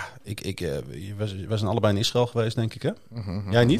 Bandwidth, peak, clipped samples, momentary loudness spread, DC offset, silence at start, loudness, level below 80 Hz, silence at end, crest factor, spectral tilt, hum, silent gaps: 14.5 kHz; -6 dBFS; under 0.1%; 11 LU; under 0.1%; 0 s; -27 LUFS; -52 dBFS; 0 s; 20 dB; -6 dB/octave; none; none